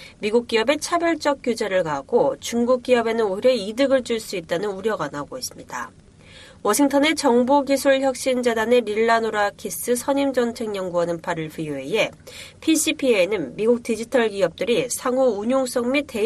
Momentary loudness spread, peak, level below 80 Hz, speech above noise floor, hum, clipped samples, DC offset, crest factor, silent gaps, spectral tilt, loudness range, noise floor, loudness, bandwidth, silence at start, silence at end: 9 LU; -6 dBFS; -56 dBFS; 25 dB; none; under 0.1%; under 0.1%; 16 dB; none; -3.5 dB/octave; 4 LU; -46 dBFS; -21 LUFS; 13.5 kHz; 0 s; 0 s